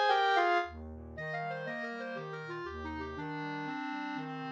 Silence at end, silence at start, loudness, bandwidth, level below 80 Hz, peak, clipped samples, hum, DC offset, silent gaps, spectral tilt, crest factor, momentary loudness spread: 0 s; 0 s; -35 LUFS; 8.4 kHz; -56 dBFS; -16 dBFS; under 0.1%; none; under 0.1%; none; -5.5 dB/octave; 18 dB; 13 LU